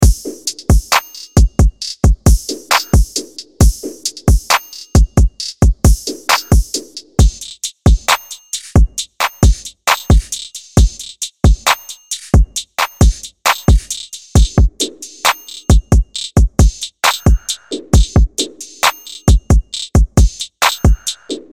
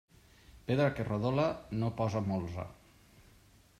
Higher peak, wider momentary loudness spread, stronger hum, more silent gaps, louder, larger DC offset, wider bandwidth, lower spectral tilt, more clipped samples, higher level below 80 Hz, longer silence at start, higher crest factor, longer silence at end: first, 0 dBFS vs -16 dBFS; about the same, 10 LU vs 12 LU; neither; neither; first, -15 LUFS vs -33 LUFS; first, 0.2% vs under 0.1%; first, 16.5 kHz vs 13.5 kHz; second, -4.5 dB/octave vs -8 dB/octave; neither; first, -16 dBFS vs -60 dBFS; second, 0 s vs 0.55 s; second, 12 dB vs 18 dB; second, 0.15 s vs 0.6 s